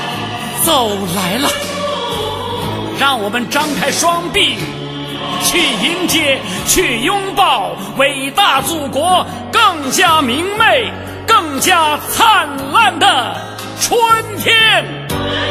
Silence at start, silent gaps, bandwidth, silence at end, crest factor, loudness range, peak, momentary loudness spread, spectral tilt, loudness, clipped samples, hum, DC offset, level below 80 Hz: 0 s; none; 16 kHz; 0 s; 14 dB; 4 LU; 0 dBFS; 10 LU; -2.5 dB/octave; -13 LUFS; under 0.1%; none; under 0.1%; -42 dBFS